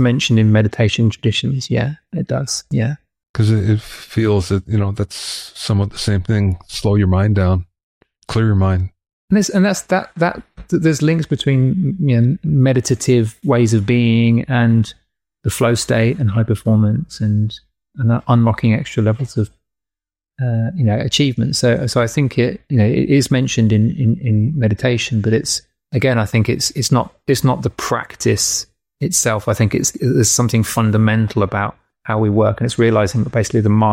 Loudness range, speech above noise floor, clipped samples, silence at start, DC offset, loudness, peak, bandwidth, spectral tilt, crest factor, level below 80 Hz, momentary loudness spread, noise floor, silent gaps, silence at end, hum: 3 LU; 74 dB; under 0.1%; 0 s; under 0.1%; -16 LUFS; -4 dBFS; 16 kHz; -5.5 dB/octave; 12 dB; -42 dBFS; 7 LU; -89 dBFS; 3.29-3.34 s, 7.83-8.01 s, 9.13-9.28 s; 0 s; none